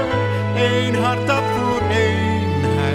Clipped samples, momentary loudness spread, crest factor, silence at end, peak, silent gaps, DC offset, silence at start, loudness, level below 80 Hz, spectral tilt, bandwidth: under 0.1%; 2 LU; 12 dB; 0 s; -6 dBFS; none; under 0.1%; 0 s; -18 LUFS; -42 dBFS; -6 dB/octave; 13 kHz